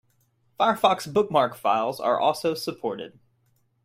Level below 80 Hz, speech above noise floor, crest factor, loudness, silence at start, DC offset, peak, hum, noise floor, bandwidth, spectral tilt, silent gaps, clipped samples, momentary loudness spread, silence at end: -68 dBFS; 44 dB; 20 dB; -24 LUFS; 0.6 s; under 0.1%; -4 dBFS; none; -67 dBFS; 16 kHz; -4.5 dB/octave; none; under 0.1%; 11 LU; 0.75 s